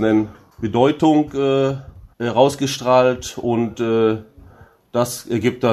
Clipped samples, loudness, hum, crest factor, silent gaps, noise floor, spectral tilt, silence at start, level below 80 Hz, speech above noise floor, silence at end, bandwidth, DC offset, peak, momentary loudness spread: under 0.1%; -19 LUFS; none; 18 dB; none; -47 dBFS; -6 dB/octave; 0 s; -50 dBFS; 29 dB; 0 s; 13.5 kHz; under 0.1%; 0 dBFS; 11 LU